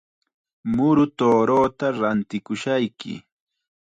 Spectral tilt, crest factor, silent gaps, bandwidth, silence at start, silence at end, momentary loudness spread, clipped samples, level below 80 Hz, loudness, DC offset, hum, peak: -7 dB/octave; 14 dB; none; 9.2 kHz; 0.65 s; 0.7 s; 16 LU; under 0.1%; -56 dBFS; -21 LUFS; under 0.1%; none; -8 dBFS